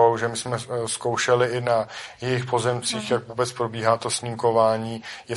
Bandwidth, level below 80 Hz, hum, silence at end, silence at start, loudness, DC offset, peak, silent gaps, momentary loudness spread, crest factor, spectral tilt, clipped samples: 11.5 kHz; -62 dBFS; none; 0 s; 0 s; -24 LUFS; under 0.1%; -4 dBFS; none; 8 LU; 18 dB; -4 dB/octave; under 0.1%